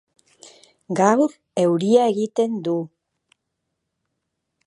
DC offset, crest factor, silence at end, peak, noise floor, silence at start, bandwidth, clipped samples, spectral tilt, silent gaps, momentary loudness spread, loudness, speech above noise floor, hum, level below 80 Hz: under 0.1%; 22 dB; 1.8 s; -2 dBFS; -78 dBFS; 0.9 s; 11.5 kHz; under 0.1%; -6 dB/octave; none; 10 LU; -20 LUFS; 59 dB; none; -74 dBFS